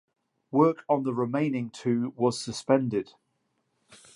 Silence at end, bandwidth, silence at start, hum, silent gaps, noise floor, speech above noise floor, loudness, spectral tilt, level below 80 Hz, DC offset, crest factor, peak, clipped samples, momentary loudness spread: 0.2 s; 11.5 kHz; 0.5 s; none; none; -75 dBFS; 49 dB; -27 LUFS; -6.5 dB/octave; -70 dBFS; under 0.1%; 20 dB; -8 dBFS; under 0.1%; 8 LU